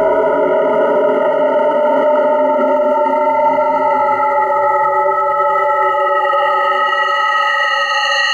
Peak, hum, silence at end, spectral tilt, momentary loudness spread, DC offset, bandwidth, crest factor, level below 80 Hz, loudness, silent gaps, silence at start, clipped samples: -4 dBFS; none; 0 s; -3 dB/octave; 1 LU; under 0.1%; 7.8 kHz; 10 dB; -58 dBFS; -13 LUFS; none; 0 s; under 0.1%